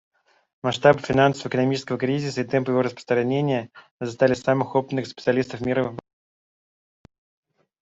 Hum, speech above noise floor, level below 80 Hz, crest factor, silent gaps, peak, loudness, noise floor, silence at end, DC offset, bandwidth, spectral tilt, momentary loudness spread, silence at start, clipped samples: none; over 68 dB; -60 dBFS; 22 dB; 3.91-3.99 s; -2 dBFS; -23 LUFS; under -90 dBFS; 1.8 s; under 0.1%; 8 kHz; -6.5 dB/octave; 11 LU; 0.65 s; under 0.1%